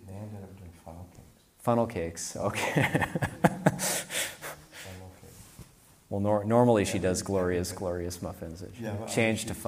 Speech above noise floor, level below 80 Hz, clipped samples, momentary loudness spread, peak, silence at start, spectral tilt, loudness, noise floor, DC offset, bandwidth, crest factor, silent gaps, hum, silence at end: 27 dB; -56 dBFS; under 0.1%; 22 LU; -6 dBFS; 0 s; -5 dB/octave; -29 LUFS; -55 dBFS; under 0.1%; 15.5 kHz; 24 dB; none; none; 0 s